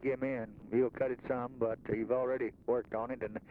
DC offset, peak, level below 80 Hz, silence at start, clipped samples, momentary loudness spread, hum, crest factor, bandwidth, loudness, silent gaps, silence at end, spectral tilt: under 0.1%; -20 dBFS; -64 dBFS; 0 s; under 0.1%; 6 LU; none; 16 dB; 4.5 kHz; -36 LUFS; none; 0 s; -10 dB/octave